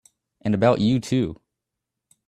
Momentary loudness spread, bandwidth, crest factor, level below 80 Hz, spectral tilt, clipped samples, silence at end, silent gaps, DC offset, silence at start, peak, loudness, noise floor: 11 LU; 12.5 kHz; 20 dB; -54 dBFS; -7 dB/octave; under 0.1%; 0.95 s; none; under 0.1%; 0.45 s; -4 dBFS; -22 LUFS; -84 dBFS